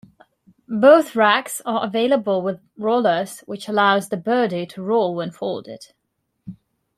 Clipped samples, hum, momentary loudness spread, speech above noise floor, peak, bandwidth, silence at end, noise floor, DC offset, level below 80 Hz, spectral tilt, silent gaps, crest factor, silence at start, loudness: under 0.1%; none; 15 LU; 55 dB; -2 dBFS; 14 kHz; 0.45 s; -74 dBFS; under 0.1%; -68 dBFS; -4.5 dB/octave; none; 18 dB; 0.7 s; -19 LUFS